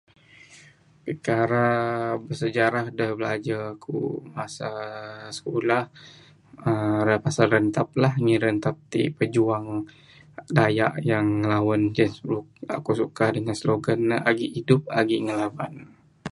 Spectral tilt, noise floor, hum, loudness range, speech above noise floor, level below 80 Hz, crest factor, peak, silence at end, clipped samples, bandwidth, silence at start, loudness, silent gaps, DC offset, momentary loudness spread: -6.5 dB/octave; -53 dBFS; none; 5 LU; 29 dB; -60 dBFS; 24 dB; 0 dBFS; 0.05 s; under 0.1%; 11.5 kHz; 0.5 s; -24 LUFS; none; under 0.1%; 12 LU